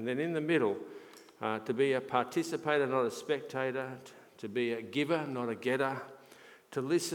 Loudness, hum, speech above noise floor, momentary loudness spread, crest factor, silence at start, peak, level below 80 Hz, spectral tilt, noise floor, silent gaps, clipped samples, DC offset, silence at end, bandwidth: -33 LUFS; none; 24 dB; 13 LU; 20 dB; 0 s; -14 dBFS; -86 dBFS; -5 dB/octave; -57 dBFS; none; under 0.1%; under 0.1%; 0 s; 18 kHz